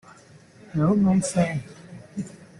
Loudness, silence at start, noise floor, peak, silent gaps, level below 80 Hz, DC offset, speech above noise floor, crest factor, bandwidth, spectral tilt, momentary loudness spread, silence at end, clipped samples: -23 LUFS; 0.75 s; -51 dBFS; -10 dBFS; none; -56 dBFS; under 0.1%; 29 dB; 16 dB; 11.5 kHz; -6.5 dB/octave; 19 LU; 0.15 s; under 0.1%